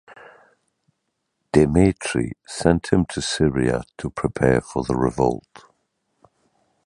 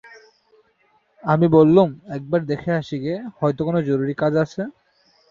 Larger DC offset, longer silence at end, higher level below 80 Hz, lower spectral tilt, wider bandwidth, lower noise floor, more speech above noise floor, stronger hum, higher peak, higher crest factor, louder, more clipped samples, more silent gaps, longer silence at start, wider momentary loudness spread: neither; first, 1.45 s vs 0.6 s; first, -40 dBFS vs -58 dBFS; second, -6 dB/octave vs -9 dB/octave; first, 11 kHz vs 7.2 kHz; first, -76 dBFS vs -62 dBFS; first, 55 dB vs 43 dB; neither; about the same, -2 dBFS vs -2 dBFS; about the same, 22 dB vs 20 dB; about the same, -21 LUFS vs -20 LUFS; neither; neither; second, 0.1 s vs 1.25 s; second, 9 LU vs 15 LU